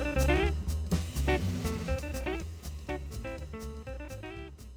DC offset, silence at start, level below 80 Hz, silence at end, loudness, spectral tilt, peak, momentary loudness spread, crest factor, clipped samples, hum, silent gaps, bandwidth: under 0.1%; 0 s; -36 dBFS; 0 s; -34 LUFS; -6 dB/octave; -14 dBFS; 14 LU; 18 dB; under 0.1%; none; none; over 20 kHz